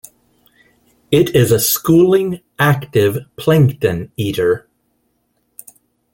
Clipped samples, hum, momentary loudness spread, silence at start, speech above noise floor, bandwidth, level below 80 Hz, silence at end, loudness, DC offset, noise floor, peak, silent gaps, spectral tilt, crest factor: under 0.1%; none; 9 LU; 1.1 s; 51 dB; 17 kHz; -48 dBFS; 1.55 s; -15 LUFS; under 0.1%; -65 dBFS; -2 dBFS; none; -5.5 dB/octave; 14 dB